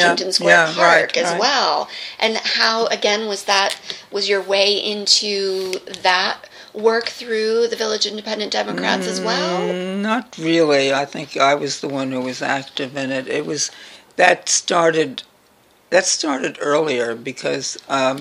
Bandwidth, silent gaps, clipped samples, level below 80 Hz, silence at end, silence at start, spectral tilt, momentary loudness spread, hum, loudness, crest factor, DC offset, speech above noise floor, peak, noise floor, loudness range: 15.5 kHz; none; under 0.1%; -68 dBFS; 0 s; 0 s; -2 dB/octave; 9 LU; none; -18 LUFS; 18 dB; under 0.1%; 35 dB; 0 dBFS; -54 dBFS; 4 LU